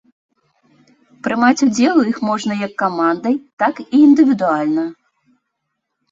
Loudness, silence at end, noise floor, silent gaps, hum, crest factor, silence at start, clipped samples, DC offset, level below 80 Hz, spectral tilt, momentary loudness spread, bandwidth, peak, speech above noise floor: -16 LUFS; 1.2 s; -75 dBFS; 3.53-3.57 s; none; 16 dB; 1.25 s; under 0.1%; under 0.1%; -62 dBFS; -5 dB/octave; 10 LU; 7.8 kHz; -2 dBFS; 60 dB